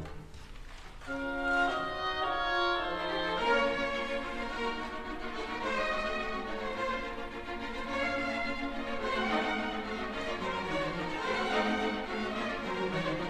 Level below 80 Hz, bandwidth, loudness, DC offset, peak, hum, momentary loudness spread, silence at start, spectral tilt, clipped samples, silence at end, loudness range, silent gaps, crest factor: -50 dBFS; 14 kHz; -33 LUFS; under 0.1%; -18 dBFS; none; 10 LU; 0 s; -4.5 dB/octave; under 0.1%; 0 s; 4 LU; none; 16 dB